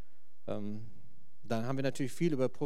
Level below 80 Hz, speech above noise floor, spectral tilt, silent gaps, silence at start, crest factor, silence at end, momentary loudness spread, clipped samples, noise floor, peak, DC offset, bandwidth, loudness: -76 dBFS; 30 dB; -6.5 dB/octave; none; 0.45 s; 18 dB; 0 s; 16 LU; under 0.1%; -63 dBFS; -18 dBFS; 2%; 15.5 kHz; -36 LUFS